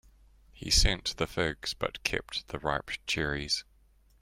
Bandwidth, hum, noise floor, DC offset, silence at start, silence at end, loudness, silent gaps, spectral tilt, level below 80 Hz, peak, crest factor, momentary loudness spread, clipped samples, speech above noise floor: 16 kHz; none; -63 dBFS; under 0.1%; 0.55 s; 0.6 s; -30 LUFS; none; -2.5 dB/octave; -40 dBFS; -10 dBFS; 22 dB; 9 LU; under 0.1%; 32 dB